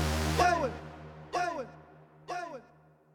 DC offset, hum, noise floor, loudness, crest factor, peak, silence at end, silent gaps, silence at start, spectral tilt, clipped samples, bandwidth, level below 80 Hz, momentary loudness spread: under 0.1%; none; -61 dBFS; -32 LUFS; 20 dB; -12 dBFS; 0.55 s; none; 0 s; -4.5 dB/octave; under 0.1%; over 20 kHz; -46 dBFS; 21 LU